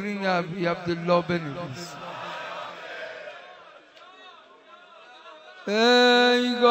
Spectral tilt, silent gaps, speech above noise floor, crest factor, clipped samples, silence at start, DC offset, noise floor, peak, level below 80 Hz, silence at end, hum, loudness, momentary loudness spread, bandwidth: -4.5 dB/octave; none; 28 dB; 20 dB; under 0.1%; 0 s; under 0.1%; -51 dBFS; -6 dBFS; -66 dBFS; 0 s; none; -23 LUFS; 21 LU; 16 kHz